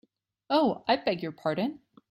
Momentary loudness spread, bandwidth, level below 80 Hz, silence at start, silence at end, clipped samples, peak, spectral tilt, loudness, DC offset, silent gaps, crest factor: 6 LU; 12.5 kHz; -70 dBFS; 0.5 s; 0.35 s; under 0.1%; -12 dBFS; -7 dB/octave; -28 LUFS; under 0.1%; none; 18 dB